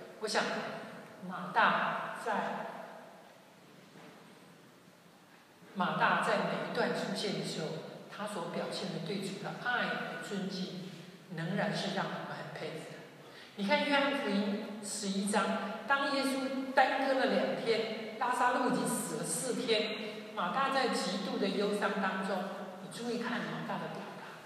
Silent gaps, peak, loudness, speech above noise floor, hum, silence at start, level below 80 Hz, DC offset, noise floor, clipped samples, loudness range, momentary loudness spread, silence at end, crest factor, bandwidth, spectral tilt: none; -14 dBFS; -34 LUFS; 26 dB; none; 0 s; -86 dBFS; under 0.1%; -59 dBFS; under 0.1%; 7 LU; 16 LU; 0 s; 22 dB; 15 kHz; -4 dB/octave